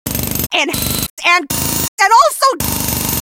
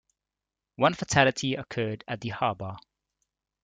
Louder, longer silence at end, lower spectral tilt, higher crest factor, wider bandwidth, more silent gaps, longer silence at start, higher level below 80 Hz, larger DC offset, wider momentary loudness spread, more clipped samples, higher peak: first, -13 LUFS vs -27 LUFS; second, 0.2 s vs 0.85 s; second, -2.5 dB/octave vs -4.5 dB/octave; second, 14 dB vs 26 dB; first, 17.5 kHz vs 9.6 kHz; first, 1.10-1.17 s, 1.88-1.98 s vs none; second, 0.05 s vs 0.8 s; first, -34 dBFS vs -60 dBFS; neither; second, 7 LU vs 14 LU; neither; first, 0 dBFS vs -4 dBFS